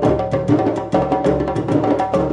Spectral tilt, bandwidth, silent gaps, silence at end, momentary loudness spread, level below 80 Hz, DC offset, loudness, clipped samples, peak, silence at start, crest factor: -8.5 dB/octave; 9.8 kHz; none; 0 s; 2 LU; -38 dBFS; under 0.1%; -18 LUFS; under 0.1%; -4 dBFS; 0 s; 14 dB